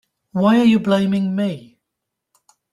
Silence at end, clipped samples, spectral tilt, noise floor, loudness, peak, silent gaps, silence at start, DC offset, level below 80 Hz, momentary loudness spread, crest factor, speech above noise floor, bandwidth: 1.1 s; under 0.1%; -7.5 dB/octave; -80 dBFS; -17 LUFS; -4 dBFS; none; 0.35 s; under 0.1%; -60 dBFS; 12 LU; 16 dB; 64 dB; 11.5 kHz